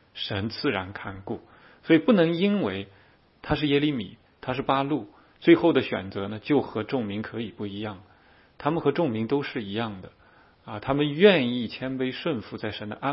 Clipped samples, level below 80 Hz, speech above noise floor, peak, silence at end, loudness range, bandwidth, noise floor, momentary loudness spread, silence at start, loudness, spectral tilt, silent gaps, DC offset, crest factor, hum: under 0.1%; -56 dBFS; 32 dB; -4 dBFS; 0 s; 5 LU; 5.8 kHz; -57 dBFS; 17 LU; 0.15 s; -26 LUFS; -10.5 dB/octave; none; under 0.1%; 22 dB; none